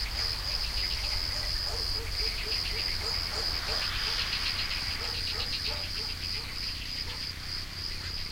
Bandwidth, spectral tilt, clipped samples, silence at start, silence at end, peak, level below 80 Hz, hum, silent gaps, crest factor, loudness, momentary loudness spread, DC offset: 16 kHz; -2 dB/octave; under 0.1%; 0 s; 0 s; -18 dBFS; -40 dBFS; none; none; 14 dB; -30 LUFS; 6 LU; under 0.1%